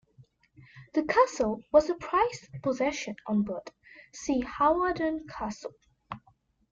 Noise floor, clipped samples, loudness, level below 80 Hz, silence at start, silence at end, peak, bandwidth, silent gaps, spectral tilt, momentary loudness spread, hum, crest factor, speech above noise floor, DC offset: -66 dBFS; under 0.1%; -28 LUFS; -58 dBFS; 0.75 s; 0.55 s; -8 dBFS; 7.8 kHz; none; -5 dB/octave; 20 LU; none; 22 dB; 38 dB; under 0.1%